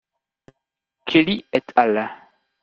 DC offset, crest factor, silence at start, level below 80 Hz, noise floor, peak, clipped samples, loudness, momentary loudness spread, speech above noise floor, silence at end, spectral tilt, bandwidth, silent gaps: under 0.1%; 20 dB; 1.05 s; -62 dBFS; -81 dBFS; -2 dBFS; under 0.1%; -19 LUFS; 12 LU; 62 dB; 0.5 s; -6.5 dB/octave; 6.8 kHz; none